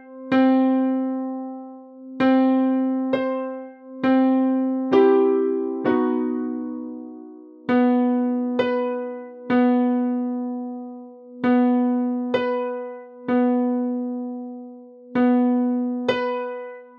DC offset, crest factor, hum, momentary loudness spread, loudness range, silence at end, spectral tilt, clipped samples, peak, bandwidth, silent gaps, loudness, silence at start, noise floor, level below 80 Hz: under 0.1%; 16 dB; none; 17 LU; 3 LU; 0.1 s; -7.5 dB/octave; under 0.1%; -4 dBFS; 5.2 kHz; none; -21 LUFS; 0 s; -42 dBFS; -70 dBFS